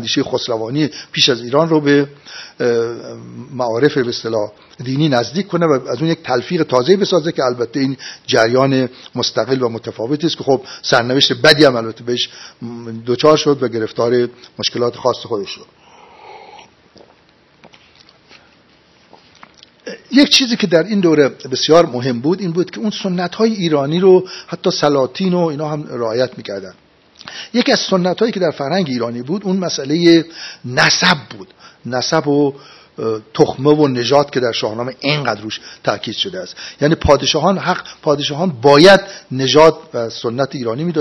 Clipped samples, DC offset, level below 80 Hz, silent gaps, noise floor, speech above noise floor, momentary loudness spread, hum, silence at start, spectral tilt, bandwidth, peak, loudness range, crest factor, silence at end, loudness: 0.2%; under 0.1%; -46 dBFS; none; -51 dBFS; 36 dB; 13 LU; none; 0 s; -5 dB/octave; 11 kHz; 0 dBFS; 5 LU; 16 dB; 0 s; -15 LUFS